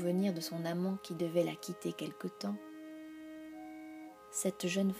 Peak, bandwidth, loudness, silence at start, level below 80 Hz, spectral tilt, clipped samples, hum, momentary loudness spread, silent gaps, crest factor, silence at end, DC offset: -20 dBFS; 15.5 kHz; -37 LUFS; 0 s; -80 dBFS; -5 dB/octave; under 0.1%; none; 15 LU; none; 18 dB; 0 s; under 0.1%